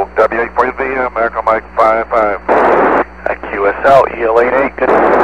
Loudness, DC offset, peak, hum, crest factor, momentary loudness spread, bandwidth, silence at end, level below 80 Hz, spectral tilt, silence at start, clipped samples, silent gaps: -12 LUFS; 0.7%; 0 dBFS; none; 12 dB; 6 LU; 10 kHz; 0 s; -36 dBFS; -6.5 dB/octave; 0 s; 0.3%; none